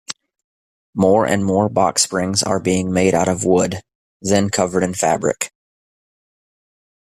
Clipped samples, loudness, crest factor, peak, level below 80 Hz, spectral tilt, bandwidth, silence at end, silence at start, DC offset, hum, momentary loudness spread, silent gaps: under 0.1%; -17 LUFS; 18 dB; -2 dBFS; -52 dBFS; -4.5 dB/octave; 15 kHz; 1.65 s; 0.1 s; under 0.1%; none; 11 LU; 0.44-0.93 s, 3.95-4.20 s